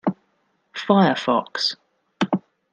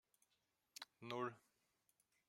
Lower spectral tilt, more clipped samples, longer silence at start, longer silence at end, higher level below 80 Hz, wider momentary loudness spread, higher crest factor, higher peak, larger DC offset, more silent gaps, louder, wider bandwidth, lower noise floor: about the same, -5.5 dB/octave vs -4.5 dB/octave; neither; second, 0.05 s vs 0.8 s; second, 0.35 s vs 0.9 s; first, -70 dBFS vs under -90 dBFS; about the same, 16 LU vs 15 LU; about the same, 20 dB vs 24 dB; first, -4 dBFS vs -32 dBFS; neither; neither; first, -21 LUFS vs -51 LUFS; second, 8.6 kHz vs 16 kHz; second, -68 dBFS vs -87 dBFS